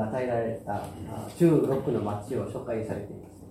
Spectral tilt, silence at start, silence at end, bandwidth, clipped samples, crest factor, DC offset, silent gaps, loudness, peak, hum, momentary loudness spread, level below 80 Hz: -8 dB/octave; 0 s; 0 s; 15 kHz; under 0.1%; 18 dB; under 0.1%; none; -29 LUFS; -10 dBFS; none; 15 LU; -56 dBFS